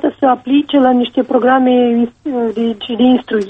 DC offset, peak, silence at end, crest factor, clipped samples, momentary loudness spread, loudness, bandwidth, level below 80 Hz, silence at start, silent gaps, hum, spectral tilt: under 0.1%; -2 dBFS; 0 s; 10 dB; under 0.1%; 7 LU; -13 LUFS; 4 kHz; -52 dBFS; 0.05 s; none; none; -7 dB/octave